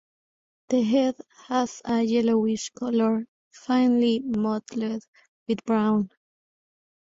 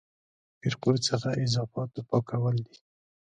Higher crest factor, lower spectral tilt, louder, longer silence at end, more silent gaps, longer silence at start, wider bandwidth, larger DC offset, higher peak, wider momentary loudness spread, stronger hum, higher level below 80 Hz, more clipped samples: second, 14 dB vs 20 dB; about the same, -5.5 dB/octave vs -5.5 dB/octave; first, -25 LUFS vs -29 LUFS; first, 1.1 s vs 0.7 s; first, 3.28-3.51 s, 5.08-5.13 s, 5.28-5.46 s vs none; about the same, 0.7 s vs 0.65 s; second, 7.8 kHz vs 9.4 kHz; neither; about the same, -12 dBFS vs -10 dBFS; first, 12 LU vs 8 LU; neither; about the same, -66 dBFS vs -62 dBFS; neither